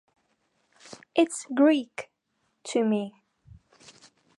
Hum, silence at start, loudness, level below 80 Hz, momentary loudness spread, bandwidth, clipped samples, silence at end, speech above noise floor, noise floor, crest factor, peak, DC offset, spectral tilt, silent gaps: none; 0.9 s; -25 LUFS; -70 dBFS; 24 LU; 11.5 kHz; under 0.1%; 1.3 s; 51 dB; -75 dBFS; 20 dB; -8 dBFS; under 0.1%; -4.5 dB/octave; none